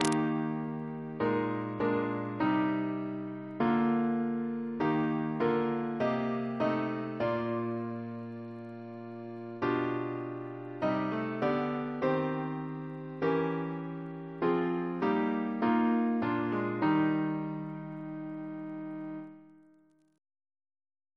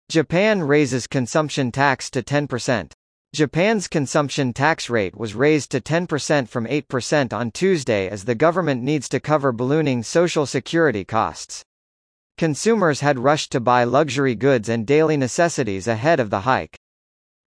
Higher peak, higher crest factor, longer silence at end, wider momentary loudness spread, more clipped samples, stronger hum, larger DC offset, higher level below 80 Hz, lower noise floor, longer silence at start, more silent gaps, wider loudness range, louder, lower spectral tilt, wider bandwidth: second, -10 dBFS vs -2 dBFS; about the same, 22 dB vs 18 dB; first, 1.6 s vs 0.7 s; first, 12 LU vs 6 LU; neither; neither; neither; second, -70 dBFS vs -56 dBFS; second, -65 dBFS vs under -90 dBFS; about the same, 0 s vs 0.1 s; second, none vs 2.94-3.25 s, 11.66-12.30 s; first, 6 LU vs 3 LU; second, -32 LUFS vs -20 LUFS; first, -7 dB/octave vs -5 dB/octave; about the same, 11 kHz vs 10.5 kHz